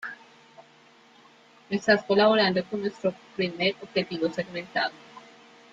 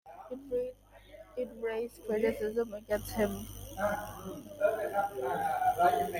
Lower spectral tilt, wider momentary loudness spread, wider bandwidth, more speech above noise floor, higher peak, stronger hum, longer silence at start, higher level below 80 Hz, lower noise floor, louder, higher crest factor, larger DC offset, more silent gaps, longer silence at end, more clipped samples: about the same, -5.5 dB/octave vs -5 dB/octave; about the same, 13 LU vs 14 LU; second, 7.8 kHz vs 17 kHz; first, 30 dB vs 22 dB; first, -8 dBFS vs -14 dBFS; second, none vs 50 Hz at -50 dBFS; about the same, 0 s vs 0.05 s; second, -70 dBFS vs -56 dBFS; about the same, -56 dBFS vs -54 dBFS; first, -26 LUFS vs -34 LUFS; about the same, 20 dB vs 20 dB; neither; neither; first, 0.55 s vs 0 s; neither